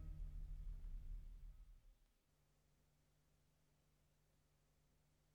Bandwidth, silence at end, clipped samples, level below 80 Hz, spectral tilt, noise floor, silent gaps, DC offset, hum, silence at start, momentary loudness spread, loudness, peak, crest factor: 8 kHz; 1.3 s; under 0.1%; -56 dBFS; -7 dB/octave; -81 dBFS; none; under 0.1%; none; 0 s; 9 LU; -58 LUFS; -42 dBFS; 16 dB